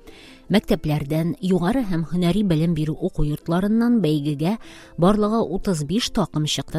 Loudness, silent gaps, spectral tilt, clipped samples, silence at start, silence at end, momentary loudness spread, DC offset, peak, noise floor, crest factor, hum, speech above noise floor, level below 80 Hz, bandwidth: -22 LUFS; none; -6.5 dB/octave; under 0.1%; 0.05 s; 0 s; 6 LU; under 0.1%; -4 dBFS; -44 dBFS; 18 dB; none; 24 dB; -36 dBFS; 15.5 kHz